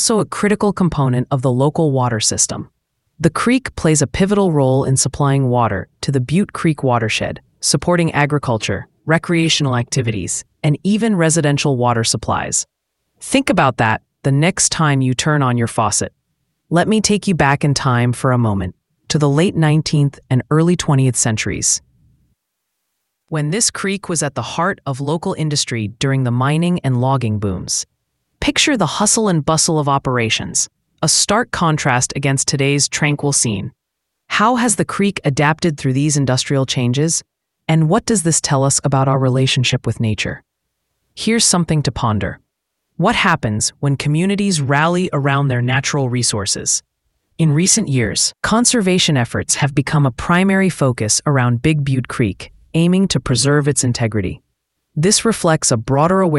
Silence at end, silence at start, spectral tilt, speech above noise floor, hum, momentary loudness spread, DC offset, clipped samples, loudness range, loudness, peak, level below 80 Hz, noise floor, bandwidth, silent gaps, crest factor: 0 s; 0 s; -4.5 dB/octave; 60 dB; none; 6 LU; under 0.1%; under 0.1%; 3 LU; -16 LUFS; 0 dBFS; -44 dBFS; -76 dBFS; 12 kHz; none; 16 dB